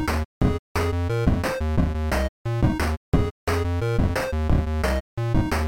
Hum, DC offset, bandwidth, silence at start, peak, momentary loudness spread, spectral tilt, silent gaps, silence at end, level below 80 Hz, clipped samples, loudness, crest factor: none; under 0.1%; 17 kHz; 0 s; -8 dBFS; 3 LU; -6.5 dB/octave; 0.25-0.41 s, 0.59-0.75 s, 2.29-2.45 s, 2.97-3.12 s, 3.31-3.47 s, 5.00-5.17 s; 0 s; -28 dBFS; under 0.1%; -24 LUFS; 14 dB